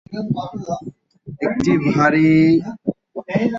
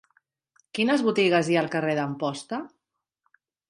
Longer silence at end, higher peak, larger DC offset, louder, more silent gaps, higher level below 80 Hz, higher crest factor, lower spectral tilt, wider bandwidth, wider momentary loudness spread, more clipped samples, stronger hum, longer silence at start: second, 0 s vs 1 s; first, -4 dBFS vs -8 dBFS; neither; first, -18 LUFS vs -25 LUFS; neither; first, -50 dBFS vs -74 dBFS; about the same, 14 dB vs 18 dB; first, -7.5 dB/octave vs -5.5 dB/octave; second, 7.6 kHz vs 11.5 kHz; about the same, 16 LU vs 14 LU; neither; neither; second, 0.1 s vs 0.75 s